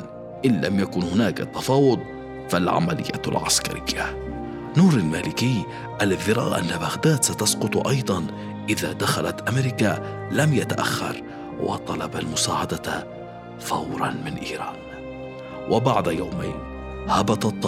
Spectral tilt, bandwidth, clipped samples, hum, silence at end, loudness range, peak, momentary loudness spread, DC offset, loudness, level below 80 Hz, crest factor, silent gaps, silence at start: -4.5 dB/octave; 16 kHz; under 0.1%; none; 0 s; 5 LU; -6 dBFS; 14 LU; under 0.1%; -23 LUFS; -46 dBFS; 18 dB; none; 0 s